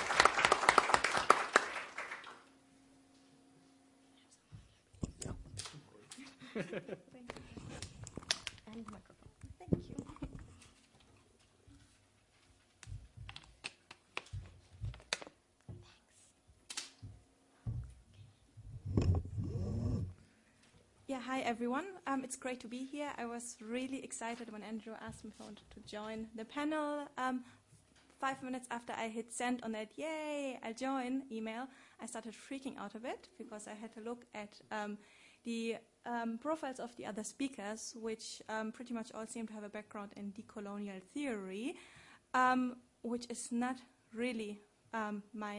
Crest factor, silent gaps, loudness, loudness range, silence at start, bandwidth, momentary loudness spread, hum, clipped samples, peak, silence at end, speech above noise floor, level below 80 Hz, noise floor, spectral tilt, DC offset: 34 dB; none; -40 LUFS; 12 LU; 0 s; 11.5 kHz; 19 LU; none; under 0.1%; -8 dBFS; 0 s; 28 dB; -60 dBFS; -70 dBFS; -4 dB/octave; under 0.1%